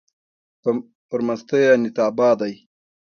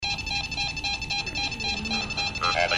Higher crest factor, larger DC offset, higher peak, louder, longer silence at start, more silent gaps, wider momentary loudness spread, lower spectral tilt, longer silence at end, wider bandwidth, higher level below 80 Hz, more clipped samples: about the same, 16 dB vs 18 dB; neither; first, -4 dBFS vs -10 dBFS; first, -20 LUFS vs -27 LUFS; first, 0.65 s vs 0 s; first, 0.95-1.09 s vs none; first, 11 LU vs 3 LU; first, -6 dB/octave vs -2.5 dB/octave; first, 0.55 s vs 0 s; second, 6.8 kHz vs 14 kHz; second, -66 dBFS vs -42 dBFS; neither